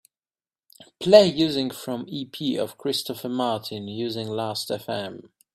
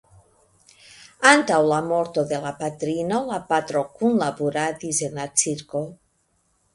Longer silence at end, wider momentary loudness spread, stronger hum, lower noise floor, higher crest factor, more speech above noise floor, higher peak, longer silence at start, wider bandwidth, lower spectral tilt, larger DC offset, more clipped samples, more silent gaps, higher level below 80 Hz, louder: second, 0.35 s vs 0.8 s; first, 16 LU vs 12 LU; neither; first, under -90 dBFS vs -67 dBFS; about the same, 24 dB vs 24 dB; first, over 66 dB vs 45 dB; about the same, 0 dBFS vs 0 dBFS; second, 0.8 s vs 1 s; first, 14.5 kHz vs 11.5 kHz; first, -5 dB/octave vs -3.5 dB/octave; neither; neither; neither; about the same, -64 dBFS vs -64 dBFS; about the same, -24 LUFS vs -22 LUFS